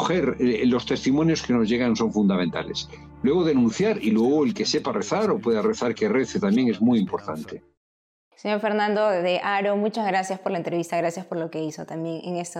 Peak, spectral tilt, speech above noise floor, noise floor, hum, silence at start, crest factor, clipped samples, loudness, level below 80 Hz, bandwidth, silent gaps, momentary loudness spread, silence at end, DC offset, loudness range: -12 dBFS; -5.5 dB/octave; over 67 dB; under -90 dBFS; none; 0 s; 10 dB; under 0.1%; -23 LUFS; -56 dBFS; 11.5 kHz; 7.77-8.31 s; 10 LU; 0 s; under 0.1%; 3 LU